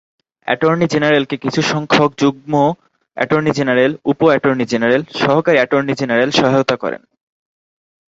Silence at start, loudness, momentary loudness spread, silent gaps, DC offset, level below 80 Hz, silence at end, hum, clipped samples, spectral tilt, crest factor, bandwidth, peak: 0.45 s; -15 LUFS; 8 LU; none; under 0.1%; -56 dBFS; 1.15 s; none; under 0.1%; -5.5 dB/octave; 14 dB; 8 kHz; 0 dBFS